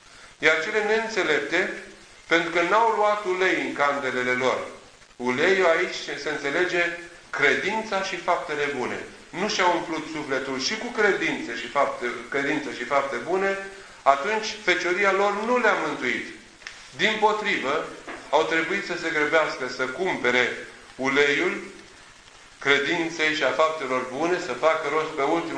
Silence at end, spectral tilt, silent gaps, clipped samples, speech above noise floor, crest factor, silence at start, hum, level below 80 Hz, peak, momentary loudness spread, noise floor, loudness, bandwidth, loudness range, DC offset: 0 s; -3 dB/octave; none; under 0.1%; 25 dB; 22 dB; 0.1 s; none; -60 dBFS; -2 dBFS; 10 LU; -49 dBFS; -24 LUFS; 10.5 kHz; 2 LU; under 0.1%